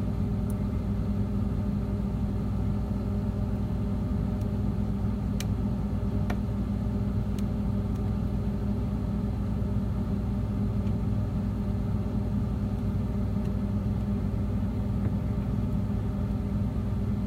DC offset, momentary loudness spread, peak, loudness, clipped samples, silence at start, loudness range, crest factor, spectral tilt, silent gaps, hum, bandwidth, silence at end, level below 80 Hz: under 0.1%; 1 LU; -14 dBFS; -30 LUFS; under 0.1%; 0 s; 0 LU; 14 dB; -9 dB/octave; none; none; 14.5 kHz; 0 s; -34 dBFS